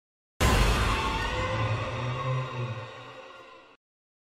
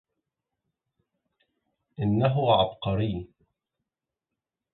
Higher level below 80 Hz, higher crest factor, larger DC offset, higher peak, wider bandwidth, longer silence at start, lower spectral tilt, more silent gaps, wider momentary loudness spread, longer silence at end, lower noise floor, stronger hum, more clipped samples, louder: first, -34 dBFS vs -52 dBFS; about the same, 18 dB vs 22 dB; neither; about the same, -10 dBFS vs -8 dBFS; first, 15.5 kHz vs 4.3 kHz; second, 0.4 s vs 2 s; second, -4.5 dB/octave vs -11 dB/octave; neither; first, 20 LU vs 9 LU; second, 0.6 s vs 1.45 s; second, -49 dBFS vs -88 dBFS; neither; neither; second, -28 LUFS vs -25 LUFS